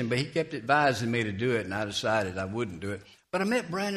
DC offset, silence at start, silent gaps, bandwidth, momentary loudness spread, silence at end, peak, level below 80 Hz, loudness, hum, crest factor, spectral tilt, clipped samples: under 0.1%; 0 s; none; 14.5 kHz; 10 LU; 0 s; -8 dBFS; -62 dBFS; -29 LUFS; none; 20 dB; -5 dB/octave; under 0.1%